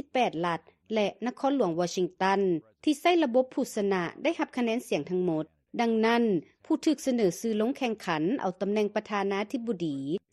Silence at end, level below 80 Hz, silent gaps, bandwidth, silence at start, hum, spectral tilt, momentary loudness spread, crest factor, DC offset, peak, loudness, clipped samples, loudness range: 0.15 s; -72 dBFS; none; 13 kHz; 0.15 s; none; -5.5 dB/octave; 7 LU; 16 dB; under 0.1%; -12 dBFS; -29 LUFS; under 0.1%; 1 LU